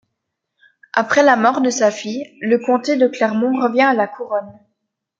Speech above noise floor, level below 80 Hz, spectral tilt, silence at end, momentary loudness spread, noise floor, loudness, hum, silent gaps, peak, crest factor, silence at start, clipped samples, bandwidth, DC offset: 61 dB; -68 dBFS; -4 dB/octave; 0.7 s; 11 LU; -77 dBFS; -17 LUFS; none; none; 0 dBFS; 16 dB; 0.95 s; under 0.1%; 7.8 kHz; under 0.1%